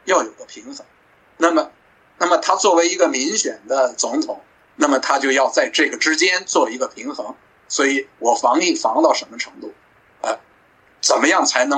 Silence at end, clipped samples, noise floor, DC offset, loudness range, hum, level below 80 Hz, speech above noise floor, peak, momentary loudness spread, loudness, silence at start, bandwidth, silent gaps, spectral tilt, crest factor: 0 s; under 0.1%; -54 dBFS; under 0.1%; 2 LU; none; -70 dBFS; 36 dB; -2 dBFS; 16 LU; -18 LUFS; 0.05 s; 9.4 kHz; none; -0.5 dB/octave; 18 dB